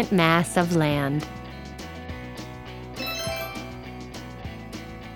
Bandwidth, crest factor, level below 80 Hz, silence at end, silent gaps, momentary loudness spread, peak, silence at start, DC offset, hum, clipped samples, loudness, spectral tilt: 19 kHz; 24 dB; -46 dBFS; 0 s; none; 18 LU; -2 dBFS; 0 s; under 0.1%; none; under 0.1%; -26 LUFS; -5.5 dB/octave